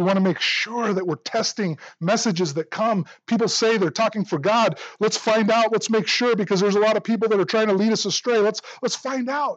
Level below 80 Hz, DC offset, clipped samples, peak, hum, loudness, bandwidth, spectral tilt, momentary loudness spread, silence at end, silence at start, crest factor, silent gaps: -80 dBFS; under 0.1%; under 0.1%; -10 dBFS; none; -21 LUFS; 8.8 kHz; -4 dB/octave; 6 LU; 0 s; 0 s; 12 dB; none